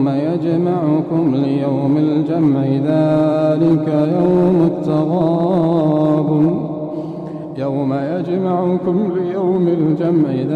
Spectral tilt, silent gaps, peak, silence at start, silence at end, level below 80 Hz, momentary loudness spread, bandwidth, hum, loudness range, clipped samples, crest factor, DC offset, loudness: -10 dB/octave; none; -6 dBFS; 0 s; 0 s; -54 dBFS; 6 LU; 4.9 kHz; none; 4 LU; under 0.1%; 10 dB; under 0.1%; -16 LUFS